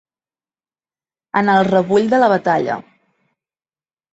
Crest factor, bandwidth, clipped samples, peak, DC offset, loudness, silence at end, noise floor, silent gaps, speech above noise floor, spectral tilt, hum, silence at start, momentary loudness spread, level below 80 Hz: 16 dB; 8 kHz; under 0.1%; -2 dBFS; under 0.1%; -15 LUFS; 1.35 s; under -90 dBFS; none; over 76 dB; -7 dB/octave; none; 1.35 s; 9 LU; -60 dBFS